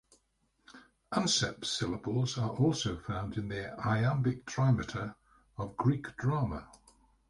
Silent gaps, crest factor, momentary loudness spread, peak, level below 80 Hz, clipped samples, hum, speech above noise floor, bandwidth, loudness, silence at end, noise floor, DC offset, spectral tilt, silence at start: none; 18 dB; 10 LU; -16 dBFS; -56 dBFS; under 0.1%; none; 43 dB; 11.5 kHz; -33 LUFS; 0.6 s; -75 dBFS; under 0.1%; -5 dB/octave; 0.7 s